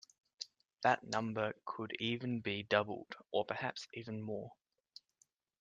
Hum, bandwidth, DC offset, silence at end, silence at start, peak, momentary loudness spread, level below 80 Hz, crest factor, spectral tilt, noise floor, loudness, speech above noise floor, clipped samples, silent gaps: none; 9.4 kHz; under 0.1%; 1.05 s; 0.4 s; -16 dBFS; 16 LU; -80 dBFS; 24 dB; -5 dB/octave; -76 dBFS; -39 LUFS; 38 dB; under 0.1%; none